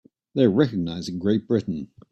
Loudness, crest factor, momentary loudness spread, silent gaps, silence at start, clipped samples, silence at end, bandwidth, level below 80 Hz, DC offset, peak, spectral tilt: -24 LUFS; 18 dB; 12 LU; none; 0.35 s; under 0.1%; 0.25 s; 8.8 kHz; -58 dBFS; under 0.1%; -6 dBFS; -7.5 dB/octave